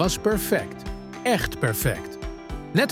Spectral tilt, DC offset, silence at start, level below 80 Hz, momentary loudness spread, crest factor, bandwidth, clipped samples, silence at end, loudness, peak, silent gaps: -4.5 dB/octave; under 0.1%; 0 s; -38 dBFS; 14 LU; 20 dB; 18 kHz; under 0.1%; 0 s; -25 LUFS; -6 dBFS; none